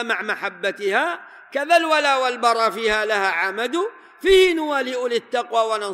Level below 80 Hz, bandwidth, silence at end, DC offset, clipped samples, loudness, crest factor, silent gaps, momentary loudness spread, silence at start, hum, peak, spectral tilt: -50 dBFS; 15.5 kHz; 0 s; under 0.1%; under 0.1%; -20 LUFS; 16 dB; none; 10 LU; 0 s; none; -4 dBFS; -2.5 dB/octave